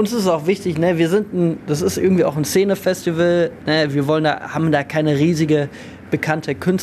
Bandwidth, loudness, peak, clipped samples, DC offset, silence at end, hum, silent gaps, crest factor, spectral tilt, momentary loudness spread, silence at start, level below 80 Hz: 14 kHz; -18 LUFS; -2 dBFS; under 0.1%; under 0.1%; 0 s; none; none; 14 dB; -6 dB/octave; 4 LU; 0 s; -54 dBFS